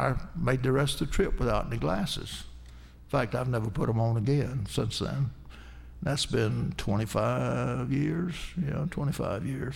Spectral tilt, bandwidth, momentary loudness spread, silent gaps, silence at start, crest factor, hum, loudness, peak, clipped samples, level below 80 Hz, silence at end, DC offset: -6 dB/octave; 16 kHz; 8 LU; none; 0 s; 18 dB; none; -30 LUFS; -12 dBFS; under 0.1%; -40 dBFS; 0 s; under 0.1%